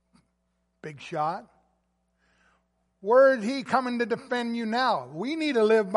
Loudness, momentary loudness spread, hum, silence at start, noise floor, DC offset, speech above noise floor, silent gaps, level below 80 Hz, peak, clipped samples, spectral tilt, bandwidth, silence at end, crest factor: -25 LUFS; 18 LU; none; 0.85 s; -74 dBFS; under 0.1%; 50 dB; none; -74 dBFS; -8 dBFS; under 0.1%; -5.5 dB/octave; 11.5 kHz; 0 s; 18 dB